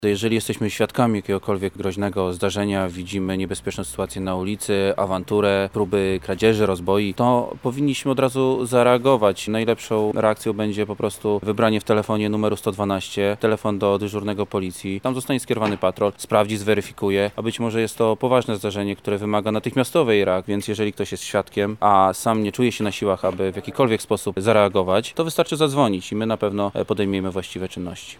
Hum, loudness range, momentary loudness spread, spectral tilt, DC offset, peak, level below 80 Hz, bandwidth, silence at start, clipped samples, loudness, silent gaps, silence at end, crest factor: none; 3 LU; 7 LU; -5.5 dB/octave; 0.1%; -2 dBFS; -52 dBFS; 18.5 kHz; 0 s; under 0.1%; -21 LUFS; none; 0.05 s; 18 dB